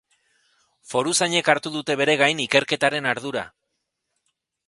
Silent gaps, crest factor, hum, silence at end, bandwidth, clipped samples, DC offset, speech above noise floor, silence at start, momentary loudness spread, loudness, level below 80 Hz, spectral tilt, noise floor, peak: none; 24 dB; none; 1.2 s; 11.5 kHz; under 0.1%; under 0.1%; 56 dB; 0.9 s; 10 LU; -21 LUFS; -68 dBFS; -2.5 dB/octave; -78 dBFS; -2 dBFS